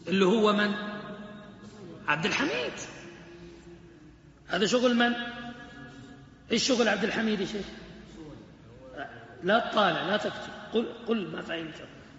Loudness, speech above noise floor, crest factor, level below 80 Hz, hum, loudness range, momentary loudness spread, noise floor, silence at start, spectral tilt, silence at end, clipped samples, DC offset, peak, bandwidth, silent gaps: -28 LUFS; 26 dB; 20 dB; -60 dBFS; none; 5 LU; 23 LU; -53 dBFS; 0 s; -3 dB/octave; 0 s; under 0.1%; under 0.1%; -10 dBFS; 8 kHz; none